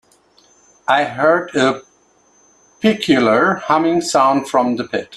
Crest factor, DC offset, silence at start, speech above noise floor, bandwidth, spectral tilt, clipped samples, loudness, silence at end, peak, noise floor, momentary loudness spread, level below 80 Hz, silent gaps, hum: 18 dB; under 0.1%; 0.9 s; 40 dB; 13 kHz; -4.5 dB/octave; under 0.1%; -15 LUFS; 0 s; 0 dBFS; -55 dBFS; 5 LU; -58 dBFS; none; none